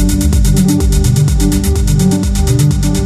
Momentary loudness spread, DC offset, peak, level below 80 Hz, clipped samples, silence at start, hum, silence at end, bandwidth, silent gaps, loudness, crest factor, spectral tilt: 2 LU; under 0.1%; 0 dBFS; -14 dBFS; under 0.1%; 0 s; none; 0 s; 15.5 kHz; none; -12 LUFS; 10 dB; -6 dB/octave